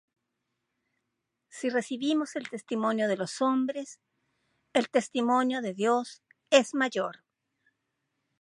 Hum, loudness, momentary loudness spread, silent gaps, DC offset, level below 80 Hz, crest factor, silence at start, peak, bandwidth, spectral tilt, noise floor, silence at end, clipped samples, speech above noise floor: none; -28 LUFS; 12 LU; none; under 0.1%; -84 dBFS; 24 dB; 1.55 s; -6 dBFS; 11.5 kHz; -4 dB/octave; -83 dBFS; 1.3 s; under 0.1%; 55 dB